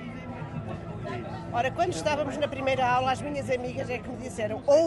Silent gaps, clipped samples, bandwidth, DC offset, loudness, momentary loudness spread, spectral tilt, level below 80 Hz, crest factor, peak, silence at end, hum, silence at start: none; under 0.1%; 12 kHz; under 0.1%; -29 LUFS; 12 LU; -5.5 dB/octave; -52 dBFS; 18 dB; -10 dBFS; 0 s; none; 0 s